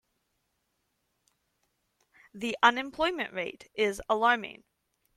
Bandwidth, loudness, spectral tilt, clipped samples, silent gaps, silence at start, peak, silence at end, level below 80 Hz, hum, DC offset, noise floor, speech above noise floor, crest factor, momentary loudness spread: 14.5 kHz; -28 LUFS; -3 dB/octave; under 0.1%; none; 2.35 s; -6 dBFS; 0.65 s; -64 dBFS; none; under 0.1%; -78 dBFS; 49 dB; 26 dB; 13 LU